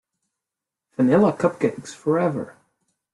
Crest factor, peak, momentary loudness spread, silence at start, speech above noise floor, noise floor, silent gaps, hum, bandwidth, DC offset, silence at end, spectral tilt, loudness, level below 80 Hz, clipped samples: 18 dB; -6 dBFS; 16 LU; 1 s; 66 dB; -86 dBFS; none; none; 11.5 kHz; under 0.1%; 0.65 s; -7.5 dB/octave; -21 LUFS; -64 dBFS; under 0.1%